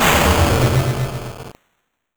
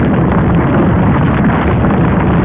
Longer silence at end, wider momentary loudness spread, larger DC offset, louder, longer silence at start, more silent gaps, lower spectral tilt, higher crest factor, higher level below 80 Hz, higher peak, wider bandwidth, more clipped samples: first, 0.65 s vs 0 s; first, 18 LU vs 1 LU; neither; second, -16 LUFS vs -11 LUFS; about the same, 0 s vs 0 s; neither; second, -4.5 dB/octave vs -12.5 dB/octave; first, 16 dB vs 8 dB; second, -28 dBFS vs -20 dBFS; about the same, -2 dBFS vs -2 dBFS; first, over 20 kHz vs 3.9 kHz; neither